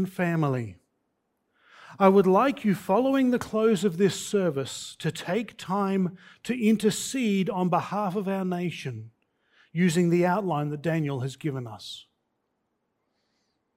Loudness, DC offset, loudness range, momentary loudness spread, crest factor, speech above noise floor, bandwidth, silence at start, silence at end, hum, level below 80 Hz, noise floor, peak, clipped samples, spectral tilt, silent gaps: -26 LUFS; under 0.1%; 4 LU; 13 LU; 22 dB; 52 dB; 16 kHz; 0 s; 1.75 s; none; -68 dBFS; -77 dBFS; -6 dBFS; under 0.1%; -6 dB/octave; none